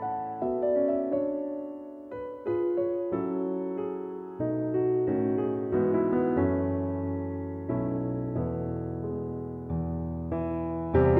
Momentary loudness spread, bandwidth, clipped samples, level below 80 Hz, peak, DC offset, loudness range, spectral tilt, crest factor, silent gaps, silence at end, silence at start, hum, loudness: 9 LU; 3.6 kHz; under 0.1%; -48 dBFS; -12 dBFS; under 0.1%; 5 LU; -12 dB/octave; 18 dB; none; 0 s; 0 s; none; -30 LUFS